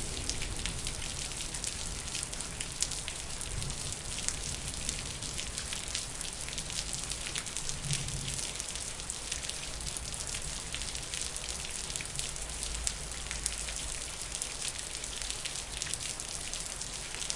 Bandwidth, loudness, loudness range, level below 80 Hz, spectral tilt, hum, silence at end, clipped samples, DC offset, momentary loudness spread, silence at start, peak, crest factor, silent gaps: 11.5 kHz; -35 LUFS; 1 LU; -46 dBFS; -1.5 dB/octave; none; 0 s; under 0.1%; under 0.1%; 3 LU; 0 s; -6 dBFS; 32 dB; none